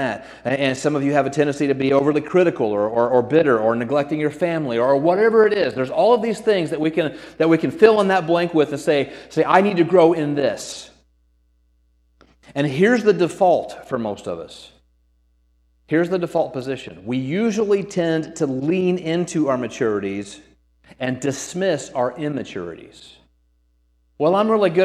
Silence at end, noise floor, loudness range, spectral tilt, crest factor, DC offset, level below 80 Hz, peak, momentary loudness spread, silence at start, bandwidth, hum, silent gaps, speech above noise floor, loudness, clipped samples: 0 s; -62 dBFS; 8 LU; -6 dB/octave; 20 dB; under 0.1%; -58 dBFS; 0 dBFS; 12 LU; 0 s; 12.5 kHz; none; none; 43 dB; -19 LUFS; under 0.1%